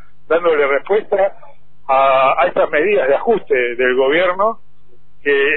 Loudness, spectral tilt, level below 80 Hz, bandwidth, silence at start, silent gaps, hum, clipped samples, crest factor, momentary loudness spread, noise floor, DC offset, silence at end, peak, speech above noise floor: -15 LUFS; -8 dB/octave; -50 dBFS; 4.1 kHz; 0.3 s; none; none; under 0.1%; 14 dB; 6 LU; -55 dBFS; 4%; 0 s; -2 dBFS; 41 dB